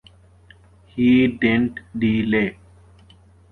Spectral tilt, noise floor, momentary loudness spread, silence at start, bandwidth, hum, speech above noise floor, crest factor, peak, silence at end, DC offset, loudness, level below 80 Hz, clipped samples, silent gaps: -8.5 dB/octave; -50 dBFS; 10 LU; 0.95 s; 4.3 kHz; none; 32 dB; 18 dB; -4 dBFS; 1 s; under 0.1%; -19 LUFS; -48 dBFS; under 0.1%; none